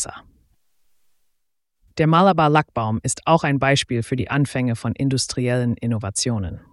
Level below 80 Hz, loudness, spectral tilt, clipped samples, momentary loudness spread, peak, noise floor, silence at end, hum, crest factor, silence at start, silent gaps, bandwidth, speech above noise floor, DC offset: -48 dBFS; -20 LUFS; -5 dB/octave; under 0.1%; 9 LU; -4 dBFS; -70 dBFS; 0.15 s; none; 18 dB; 0 s; none; 12 kHz; 50 dB; under 0.1%